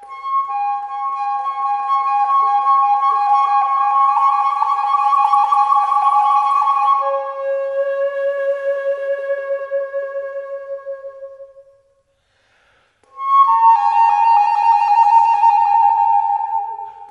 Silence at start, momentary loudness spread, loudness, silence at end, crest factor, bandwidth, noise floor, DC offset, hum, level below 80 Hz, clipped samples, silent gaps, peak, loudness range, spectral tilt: 0 s; 13 LU; -15 LUFS; 0.05 s; 14 dB; 10.5 kHz; -62 dBFS; under 0.1%; none; -72 dBFS; under 0.1%; none; -2 dBFS; 12 LU; -0.5 dB/octave